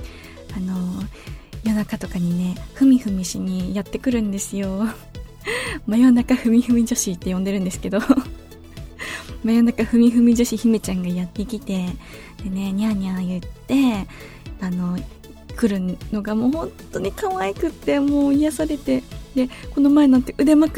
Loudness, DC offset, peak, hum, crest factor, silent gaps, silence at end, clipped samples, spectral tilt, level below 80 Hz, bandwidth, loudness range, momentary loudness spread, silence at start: -21 LUFS; under 0.1%; -2 dBFS; none; 18 dB; none; 0 s; under 0.1%; -6 dB/octave; -40 dBFS; 16 kHz; 5 LU; 17 LU; 0 s